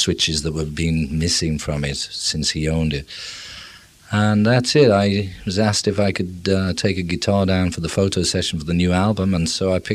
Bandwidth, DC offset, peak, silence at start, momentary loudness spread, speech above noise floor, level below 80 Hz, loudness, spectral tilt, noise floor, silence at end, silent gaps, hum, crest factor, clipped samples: 14 kHz; under 0.1%; -2 dBFS; 0 s; 8 LU; 24 dB; -38 dBFS; -19 LUFS; -5 dB/octave; -43 dBFS; 0 s; none; none; 18 dB; under 0.1%